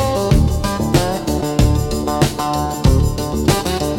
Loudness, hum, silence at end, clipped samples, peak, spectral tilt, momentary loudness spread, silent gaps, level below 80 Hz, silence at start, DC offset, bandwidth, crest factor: -17 LUFS; none; 0 s; under 0.1%; -2 dBFS; -5.5 dB/octave; 4 LU; none; -22 dBFS; 0 s; under 0.1%; 17 kHz; 14 dB